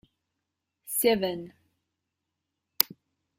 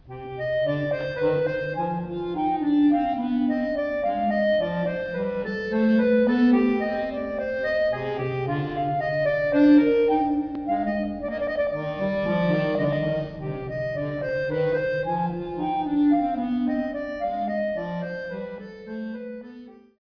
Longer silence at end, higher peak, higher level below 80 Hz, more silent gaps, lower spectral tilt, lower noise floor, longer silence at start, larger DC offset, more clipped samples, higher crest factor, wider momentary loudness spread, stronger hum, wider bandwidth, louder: first, 0.55 s vs 0.25 s; first, 0 dBFS vs -8 dBFS; second, -68 dBFS vs -52 dBFS; neither; second, -3 dB/octave vs -9 dB/octave; first, -84 dBFS vs -45 dBFS; first, 0.85 s vs 0.05 s; neither; neither; first, 32 dB vs 16 dB; first, 14 LU vs 11 LU; neither; first, 16 kHz vs 5.4 kHz; second, -27 LUFS vs -24 LUFS